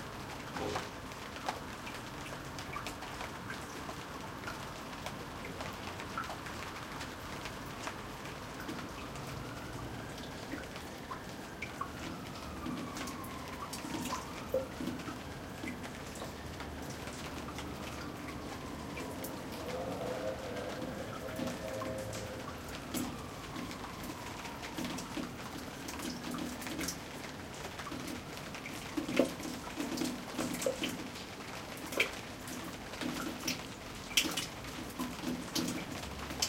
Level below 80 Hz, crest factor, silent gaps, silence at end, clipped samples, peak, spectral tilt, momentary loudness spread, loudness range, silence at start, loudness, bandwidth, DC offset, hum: -56 dBFS; 30 dB; none; 0 s; under 0.1%; -12 dBFS; -3.5 dB/octave; 8 LU; 6 LU; 0 s; -40 LUFS; 17 kHz; under 0.1%; none